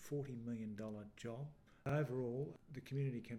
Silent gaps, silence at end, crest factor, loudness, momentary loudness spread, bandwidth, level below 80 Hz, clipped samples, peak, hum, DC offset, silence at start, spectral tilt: none; 0 s; 16 dB; -46 LUFS; 10 LU; 14 kHz; -72 dBFS; under 0.1%; -28 dBFS; none; under 0.1%; 0 s; -8 dB/octave